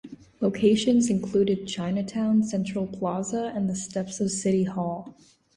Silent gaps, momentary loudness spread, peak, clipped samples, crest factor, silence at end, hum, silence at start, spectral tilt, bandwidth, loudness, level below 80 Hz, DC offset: none; 9 LU; -8 dBFS; under 0.1%; 16 dB; 0.45 s; none; 0.05 s; -5.5 dB/octave; 11.5 kHz; -26 LUFS; -60 dBFS; under 0.1%